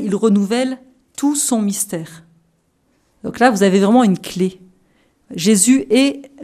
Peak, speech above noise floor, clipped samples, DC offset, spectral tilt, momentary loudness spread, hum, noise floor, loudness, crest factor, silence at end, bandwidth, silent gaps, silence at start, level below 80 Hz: 0 dBFS; 46 dB; under 0.1%; under 0.1%; -4.5 dB/octave; 18 LU; none; -62 dBFS; -15 LUFS; 16 dB; 0 s; 15 kHz; none; 0 s; -58 dBFS